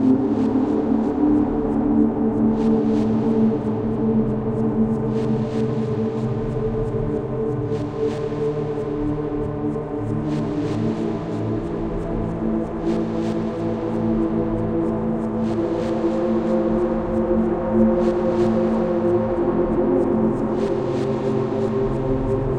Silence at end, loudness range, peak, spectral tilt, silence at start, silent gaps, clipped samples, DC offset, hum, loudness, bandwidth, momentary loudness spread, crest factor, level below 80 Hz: 0 s; 5 LU; -4 dBFS; -9.5 dB/octave; 0 s; none; under 0.1%; 0.1%; none; -21 LUFS; 8.6 kHz; 6 LU; 16 dB; -38 dBFS